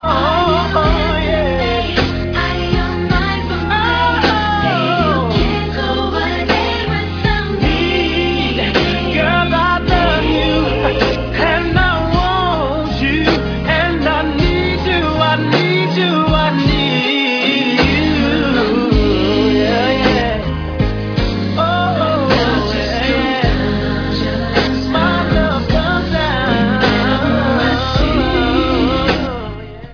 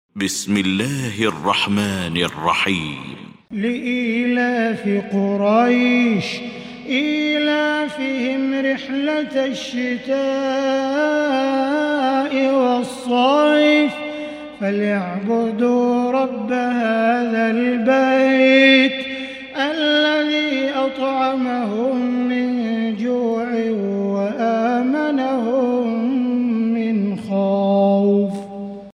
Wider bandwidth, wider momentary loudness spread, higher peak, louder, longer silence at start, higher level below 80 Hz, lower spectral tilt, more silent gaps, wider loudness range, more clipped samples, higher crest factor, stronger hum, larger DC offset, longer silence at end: second, 5.4 kHz vs 14.5 kHz; second, 4 LU vs 8 LU; about the same, 0 dBFS vs -2 dBFS; first, -14 LUFS vs -18 LUFS; second, 0 s vs 0.15 s; first, -24 dBFS vs -60 dBFS; first, -6.5 dB/octave vs -5 dB/octave; neither; second, 2 LU vs 5 LU; neither; about the same, 14 dB vs 16 dB; neither; neither; about the same, 0 s vs 0.05 s